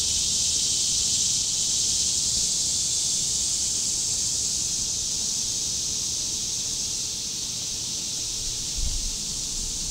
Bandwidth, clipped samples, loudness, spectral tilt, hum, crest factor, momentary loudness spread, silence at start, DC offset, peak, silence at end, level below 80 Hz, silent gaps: 16 kHz; under 0.1%; -23 LUFS; 0 dB/octave; none; 16 dB; 6 LU; 0 s; under 0.1%; -10 dBFS; 0 s; -42 dBFS; none